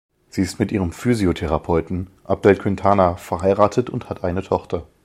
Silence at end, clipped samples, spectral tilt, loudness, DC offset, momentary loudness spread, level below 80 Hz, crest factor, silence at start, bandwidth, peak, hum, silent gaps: 0.2 s; under 0.1%; -7 dB/octave; -20 LUFS; under 0.1%; 10 LU; -40 dBFS; 20 dB; 0.35 s; 15.5 kHz; 0 dBFS; none; none